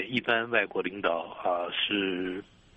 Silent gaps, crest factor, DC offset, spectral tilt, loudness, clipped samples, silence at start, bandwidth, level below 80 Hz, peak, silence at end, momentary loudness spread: none; 18 dB; under 0.1%; -6 dB/octave; -29 LUFS; under 0.1%; 0 s; 8.2 kHz; -64 dBFS; -12 dBFS; 0.35 s; 7 LU